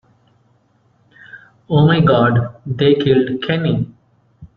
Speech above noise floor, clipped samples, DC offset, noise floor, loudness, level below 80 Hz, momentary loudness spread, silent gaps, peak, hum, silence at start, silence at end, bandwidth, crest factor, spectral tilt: 43 dB; under 0.1%; under 0.1%; -57 dBFS; -15 LUFS; -48 dBFS; 9 LU; none; -2 dBFS; none; 1.35 s; 0.1 s; 5 kHz; 16 dB; -9.5 dB/octave